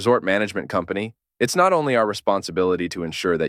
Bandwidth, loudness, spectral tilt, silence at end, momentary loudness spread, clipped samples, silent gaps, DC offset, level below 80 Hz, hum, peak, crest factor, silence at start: 15.5 kHz; -21 LUFS; -4.5 dB/octave; 0 s; 9 LU; under 0.1%; none; under 0.1%; -56 dBFS; none; -4 dBFS; 16 dB; 0 s